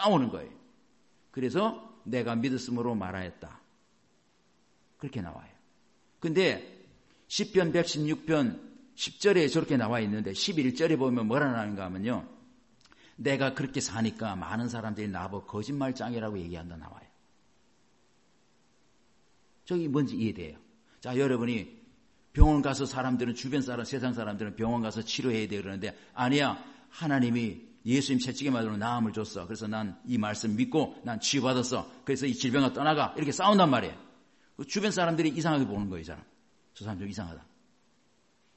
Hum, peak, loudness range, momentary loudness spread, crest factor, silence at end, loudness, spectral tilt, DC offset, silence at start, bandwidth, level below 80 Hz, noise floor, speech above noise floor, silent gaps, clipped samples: none; -4 dBFS; 9 LU; 15 LU; 26 dB; 1.15 s; -30 LUFS; -5 dB/octave; under 0.1%; 0 s; 8.6 kHz; -44 dBFS; -69 dBFS; 40 dB; none; under 0.1%